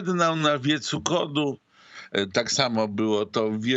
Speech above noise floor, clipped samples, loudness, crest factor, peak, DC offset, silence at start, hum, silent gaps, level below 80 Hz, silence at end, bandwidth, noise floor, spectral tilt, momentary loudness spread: 23 dB; under 0.1%; -24 LUFS; 20 dB; -6 dBFS; under 0.1%; 0 s; none; none; -68 dBFS; 0 s; 8.4 kHz; -47 dBFS; -4 dB/octave; 8 LU